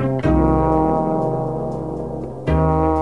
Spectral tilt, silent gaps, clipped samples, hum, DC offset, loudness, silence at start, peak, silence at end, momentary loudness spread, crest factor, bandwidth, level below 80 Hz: -10 dB/octave; none; under 0.1%; none; 0.7%; -19 LUFS; 0 s; -4 dBFS; 0 s; 10 LU; 14 dB; 10.5 kHz; -28 dBFS